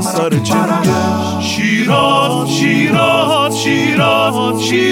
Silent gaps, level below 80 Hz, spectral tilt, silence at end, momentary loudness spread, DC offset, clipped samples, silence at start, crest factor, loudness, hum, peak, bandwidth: none; -50 dBFS; -4.5 dB/octave; 0 s; 4 LU; under 0.1%; under 0.1%; 0 s; 12 dB; -12 LUFS; none; 0 dBFS; 17 kHz